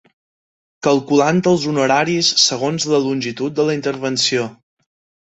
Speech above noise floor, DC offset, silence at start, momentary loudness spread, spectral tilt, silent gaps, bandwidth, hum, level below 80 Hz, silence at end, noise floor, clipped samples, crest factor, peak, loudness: over 73 dB; under 0.1%; 0.85 s; 8 LU; -3.5 dB/octave; none; 8.2 kHz; none; -60 dBFS; 0.75 s; under -90 dBFS; under 0.1%; 16 dB; -2 dBFS; -16 LUFS